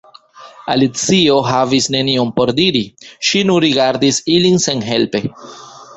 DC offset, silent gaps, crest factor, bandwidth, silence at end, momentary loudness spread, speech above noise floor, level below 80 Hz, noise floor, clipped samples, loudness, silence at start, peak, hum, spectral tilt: under 0.1%; none; 14 dB; 8.4 kHz; 0 s; 9 LU; 26 dB; -52 dBFS; -40 dBFS; under 0.1%; -14 LUFS; 0.4 s; 0 dBFS; none; -4 dB/octave